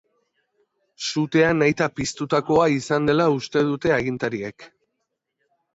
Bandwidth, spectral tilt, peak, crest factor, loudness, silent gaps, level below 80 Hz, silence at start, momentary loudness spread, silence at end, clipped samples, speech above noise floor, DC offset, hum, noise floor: 8 kHz; -5.5 dB/octave; -6 dBFS; 18 dB; -21 LUFS; none; -54 dBFS; 1 s; 9 LU; 1.1 s; under 0.1%; 57 dB; under 0.1%; none; -78 dBFS